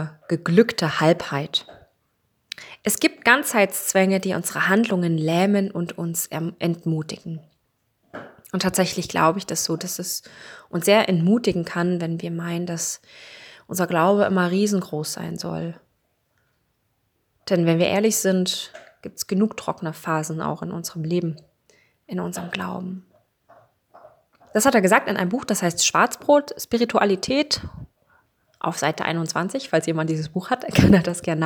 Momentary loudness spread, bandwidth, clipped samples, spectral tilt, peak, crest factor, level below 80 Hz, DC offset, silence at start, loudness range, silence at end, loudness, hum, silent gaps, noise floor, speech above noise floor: 15 LU; over 20 kHz; under 0.1%; -4.5 dB/octave; 0 dBFS; 22 dB; -50 dBFS; under 0.1%; 0 s; 8 LU; 0 s; -22 LUFS; none; none; -70 dBFS; 48 dB